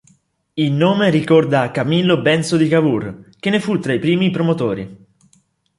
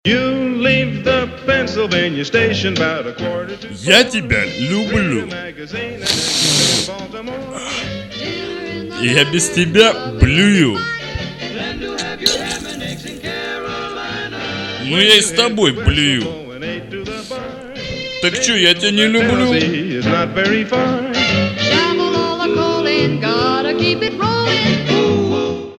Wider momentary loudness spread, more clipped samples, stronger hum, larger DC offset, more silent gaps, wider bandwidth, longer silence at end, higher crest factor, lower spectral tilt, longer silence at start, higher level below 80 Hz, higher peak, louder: second, 10 LU vs 14 LU; neither; neither; neither; neither; second, 11.5 kHz vs 16.5 kHz; first, 0.85 s vs 0.05 s; about the same, 16 dB vs 16 dB; first, -6.5 dB/octave vs -3.5 dB/octave; first, 0.55 s vs 0.05 s; second, -54 dBFS vs -36 dBFS; about the same, -2 dBFS vs 0 dBFS; about the same, -16 LUFS vs -15 LUFS